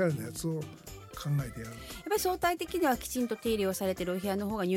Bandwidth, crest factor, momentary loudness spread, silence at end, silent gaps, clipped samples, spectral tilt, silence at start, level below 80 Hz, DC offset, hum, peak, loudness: 17 kHz; 16 dB; 13 LU; 0 s; none; under 0.1%; -5 dB/octave; 0 s; -54 dBFS; under 0.1%; none; -16 dBFS; -32 LUFS